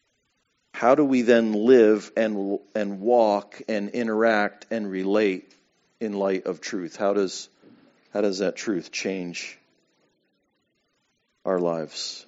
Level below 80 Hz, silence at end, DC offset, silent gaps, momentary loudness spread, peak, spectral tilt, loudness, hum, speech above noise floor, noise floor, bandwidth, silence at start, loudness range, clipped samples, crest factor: -76 dBFS; 0.05 s; under 0.1%; none; 14 LU; -4 dBFS; -4 dB/octave; -24 LUFS; none; 49 dB; -72 dBFS; 8 kHz; 0.75 s; 11 LU; under 0.1%; 20 dB